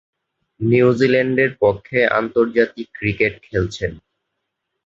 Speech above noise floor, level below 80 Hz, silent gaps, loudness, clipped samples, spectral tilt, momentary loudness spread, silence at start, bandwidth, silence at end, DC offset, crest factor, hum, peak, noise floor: 59 dB; -44 dBFS; none; -18 LUFS; under 0.1%; -7 dB/octave; 9 LU; 0.6 s; 7.8 kHz; 0.85 s; under 0.1%; 16 dB; none; -2 dBFS; -77 dBFS